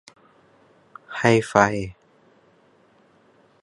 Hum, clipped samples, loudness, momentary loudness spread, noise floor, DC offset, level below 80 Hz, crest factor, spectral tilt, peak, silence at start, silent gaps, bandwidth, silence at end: none; under 0.1%; -20 LUFS; 18 LU; -58 dBFS; under 0.1%; -54 dBFS; 26 dB; -5.5 dB/octave; 0 dBFS; 1.1 s; none; 11.5 kHz; 1.7 s